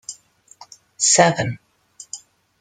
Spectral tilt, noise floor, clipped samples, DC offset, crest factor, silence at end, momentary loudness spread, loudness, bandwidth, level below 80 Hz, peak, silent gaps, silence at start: -2.5 dB/octave; -48 dBFS; under 0.1%; under 0.1%; 22 dB; 0.45 s; 23 LU; -16 LUFS; 11 kHz; -62 dBFS; -2 dBFS; none; 0.1 s